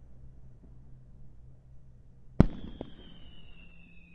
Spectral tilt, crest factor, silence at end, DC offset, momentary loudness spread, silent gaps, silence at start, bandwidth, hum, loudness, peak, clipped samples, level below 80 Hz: -9.5 dB/octave; 34 dB; 0 s; under 0.1%; 29 LU; none; 0 s; 6.6 kHz; none; -31 LUFS; 0 dBFS; under 0.1%; -42 dBFS